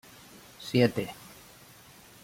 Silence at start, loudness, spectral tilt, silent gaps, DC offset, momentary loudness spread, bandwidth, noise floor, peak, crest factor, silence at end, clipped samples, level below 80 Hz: 0.6 s; -28 LUFS; -6 dB/octave; none; under 0.1%; 26 LU; 16.5 kHz; -53 dBFS; -8 dBFS; 24 dB; 1.1 s; under 0.1%; -66 dBFS